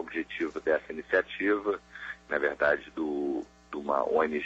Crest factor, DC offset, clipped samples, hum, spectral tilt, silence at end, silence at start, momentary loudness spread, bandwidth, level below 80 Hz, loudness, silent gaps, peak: 18 dB; under 0.1%; under 0.1%; none; -5.5 dB/octave; 0 s; 0 s; 10 LU; 8 kHz; -62 dBFS; -30 LUFS; none; -12 dBFS